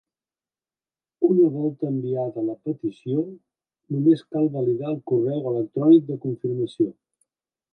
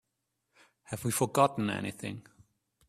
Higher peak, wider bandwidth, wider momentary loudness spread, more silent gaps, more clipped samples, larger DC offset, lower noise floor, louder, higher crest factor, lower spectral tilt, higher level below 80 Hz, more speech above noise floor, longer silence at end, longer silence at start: first, -6 dBFS vs -12 dBFS; second, 4.4 kHz vs 15.5 kHz; second, 11 LU vs 16 LU; neither; neither; neither; first, under -90 dBFS vs -83 dBFS; first, -23 LUFS vs -31 LUFS; about the same, 18 dB vs 22 dB; first, -10.5 dB/octave vs -5 dB/octave; second, -74 dBFS vs -68 dBFS; first, over 68 dB vs 52 dB; about the same, 0.8 s vs 0.7 s; first, 1.2 s vs 0.9 s